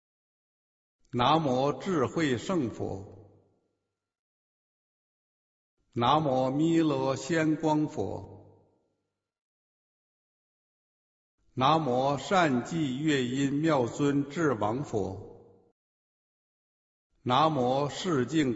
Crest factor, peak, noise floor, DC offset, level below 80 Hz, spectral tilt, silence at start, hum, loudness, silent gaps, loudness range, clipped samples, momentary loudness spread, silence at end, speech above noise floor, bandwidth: 20 dB; -10 dBFS; -82 dBFS; under 0.1%; -62 dBFS; -6 dB/octave; 1.15 s; none; -28 LUFS; 4.19-5.77 s, 9.41-11.38 s, 15.72-17.10 s; 8 LU; under 0.1%; 11 LU; 0 s; 55 dB; 8 kHz